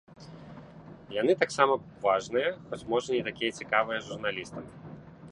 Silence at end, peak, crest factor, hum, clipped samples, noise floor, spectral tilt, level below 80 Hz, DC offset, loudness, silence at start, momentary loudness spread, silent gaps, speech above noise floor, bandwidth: 0 s; -6 dBFS; 24 dB; none; under 0.1%; -49 dBFS; -4.5 dB/octave; -64 dBFS; under 0.1%; -29 LUFS; 0.1 s; 22 LU; none; 19 dB; 11 kHz